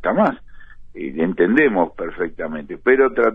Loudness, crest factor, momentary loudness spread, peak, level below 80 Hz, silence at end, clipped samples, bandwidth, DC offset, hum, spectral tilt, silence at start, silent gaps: -19 LUFS; 16 dB; 14 LU; -2 dBFS; -44 dBFS; 0 s; under 0.1%; 5.2 kHz; 0.2%; none; -9 dB/octave; 0 s; none